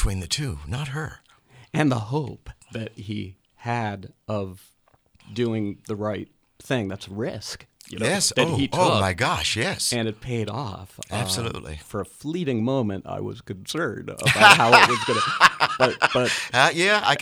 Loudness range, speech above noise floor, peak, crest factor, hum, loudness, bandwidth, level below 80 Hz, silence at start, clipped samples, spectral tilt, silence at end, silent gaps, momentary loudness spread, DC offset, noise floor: 13 LU; 37 dB; 0 dBFS; 24 dB; none; -22 LUFS; over 20 kHz; -42 dBFS; 0 s; under 0.1%; -3.5 dB/octave; 0 s; none; 18 LU; under 0.1%; -60 dBFS